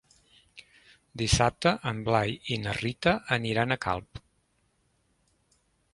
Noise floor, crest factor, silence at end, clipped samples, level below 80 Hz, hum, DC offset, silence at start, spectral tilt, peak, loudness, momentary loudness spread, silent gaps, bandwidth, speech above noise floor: -71 dBFS; 22 dB; 1.75 s; under 0.1%; -46 dBFS; none; under 0.1%; 0.55 s; -4.5 dB/octave; -8 dBFS; -28 LUFS; 8 LU; none; 11.5 kHz; 44 dB